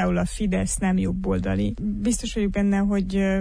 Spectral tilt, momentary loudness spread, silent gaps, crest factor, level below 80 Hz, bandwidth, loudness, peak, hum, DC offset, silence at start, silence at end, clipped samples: -6 dB/octave; 3 LU; none; 10 dB; -34 dBFS; 10.5 kHz; -24 LUFS; -12 dBFS; none; under 0.1%; 0 s; 0 s; under 0.1%